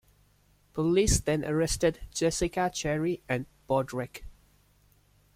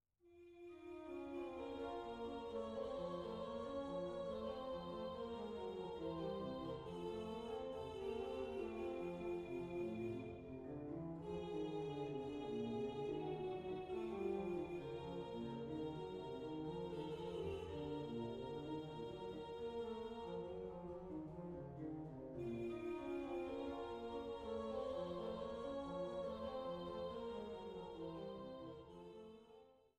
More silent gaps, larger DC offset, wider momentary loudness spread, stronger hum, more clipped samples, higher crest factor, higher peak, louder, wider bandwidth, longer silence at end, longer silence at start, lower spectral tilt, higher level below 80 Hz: neither; neither; first, 10 LU vs 6 LU; neither; neither; about the same, 18 dB vs 14 dB; first, -12 dBFS vs -32 dBFS; first, -29 LUFS vs -48 LUFS; first, 16 kHz vs 11.5 kHz; first, 1.05 s vs 0.2 s; first, 0.75 s vs 0.25 s; second, -4.5 dB/octave vs -7.5 dB/octave; first, -42 dBFS vs -66 dBFS